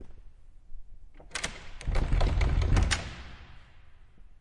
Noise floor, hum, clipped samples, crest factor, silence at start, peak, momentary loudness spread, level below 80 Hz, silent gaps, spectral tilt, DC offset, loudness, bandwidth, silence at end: -51 dBFS; none; under 0.1%; 18 dB; 0 s; -12 dBFS; 20 LU; -32 dBFS; none; -4.5 dB/octave; under 0.1%; -31 LUFS; 11.5 kHz; 0.1 s